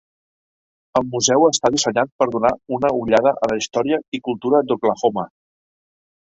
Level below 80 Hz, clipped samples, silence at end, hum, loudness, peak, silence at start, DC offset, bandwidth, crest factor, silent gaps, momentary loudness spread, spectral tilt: -56 dBFS; under 0.1%; 0.95 s; none; -19 LUFS; -2 dBFS; 0.95 s; under 0.1%; 8.2 kHz; 18 dB; 2.12-2.19 s, 4.08-4.12 s; 8 LU; -3.5 dB/octave